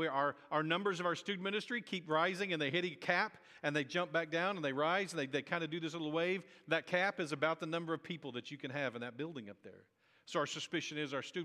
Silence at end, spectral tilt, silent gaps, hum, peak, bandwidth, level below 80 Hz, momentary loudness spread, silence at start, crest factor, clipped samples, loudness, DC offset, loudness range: 0 s; -4.5 dB/octave; none; none; -16 dBFS; 13 kHz; under -90 dBFS; 9 LU; 0 s; 22 dB; under 0.1%; -37 LUFS; under 0.1%; 6 LU